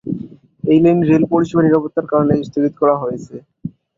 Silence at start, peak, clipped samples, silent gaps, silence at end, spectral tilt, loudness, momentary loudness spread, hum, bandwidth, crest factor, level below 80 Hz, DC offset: 0.05 s; -2 dBFS; under 0.1%; none; 0.3 s; -9 dB/octave; -15 LUFS; 19 LU; none; 7.4 kHz; 14 dB; -52 dBFS; under 0.1%